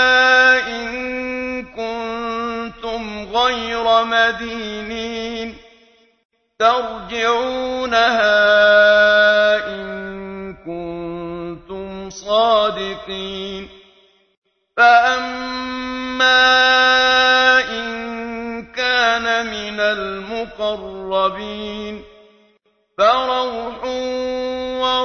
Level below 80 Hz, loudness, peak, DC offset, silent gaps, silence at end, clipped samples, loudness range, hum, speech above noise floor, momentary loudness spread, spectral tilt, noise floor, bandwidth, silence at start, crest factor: -48 dBFS; -16 LUFS; 0 dBFS; under 0.1%; 6.25-6.30 s, 14.37-14.42 s; 0 s; under 0.1%; 8 LU; none; 44 dB; 17 LU; -2.5 dB/octave; -61 dBFS; 6.6 kHz; 0 s; 16 dB